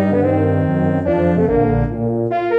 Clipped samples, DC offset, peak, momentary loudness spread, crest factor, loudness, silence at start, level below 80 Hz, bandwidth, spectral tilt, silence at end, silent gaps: under 0.1%; under 0.1%; -2 dBFS; 4 LU; 12 dB; -17 LUFS; 0 s; -32 dBFS; 5.6 kHz; -10.5 dB/octave; 0 s; none